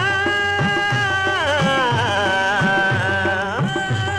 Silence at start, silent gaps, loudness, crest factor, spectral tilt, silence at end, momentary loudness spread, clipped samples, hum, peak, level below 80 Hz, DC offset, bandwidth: 0 s; none; -18 LUFS; 12 dB; -4.5 dB/octave; 0 s; 4 LU; under 0.1%; none; -6 dBFS; -48 dBFS; under 0.1%; 13.5 kHz